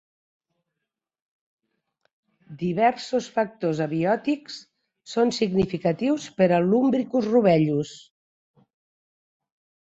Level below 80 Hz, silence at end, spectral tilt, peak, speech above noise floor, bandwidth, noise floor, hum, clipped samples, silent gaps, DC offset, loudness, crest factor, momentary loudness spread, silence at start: -60 dBFS; 1.9 s; -6.5 dB/octave; -6 dBFS; 62 dB; 8 kHz; -85 dBFS; none; under 0.1%; none; under 0.1%; -23 LUFS; 18 dB; 10 LU; 2.5 s